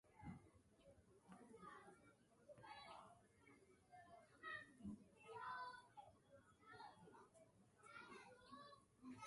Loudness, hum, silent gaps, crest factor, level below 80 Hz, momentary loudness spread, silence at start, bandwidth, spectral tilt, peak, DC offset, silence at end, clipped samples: -61 LUFS; none; none; 20 dB; -82 dBFS; 13 LU; 0.05 s; 11.5 kHz; -5 dB/octave; -42 dBFS; under 0.1%; 0 s; under 0.1%